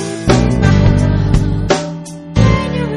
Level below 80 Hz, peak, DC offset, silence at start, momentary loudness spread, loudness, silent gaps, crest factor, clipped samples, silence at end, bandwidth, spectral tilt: -20 dBFS; 0 dBFS; under 0.1%; 0 s; 7 LU; -13 LUFS; none; 12 dB; 0.1%; 0 s; 11.5 kHz; -6.5 dB/octave